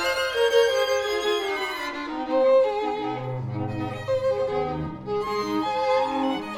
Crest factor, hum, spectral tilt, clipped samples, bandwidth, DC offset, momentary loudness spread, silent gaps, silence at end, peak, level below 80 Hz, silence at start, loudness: 16 dB; none; -4.5 dB/octave; under 0.1%; 16 kHz; under 0.1%; 10 LU; none; 0 s; -8 dBFS; -54 dBFS; 0 s; -25 LUFS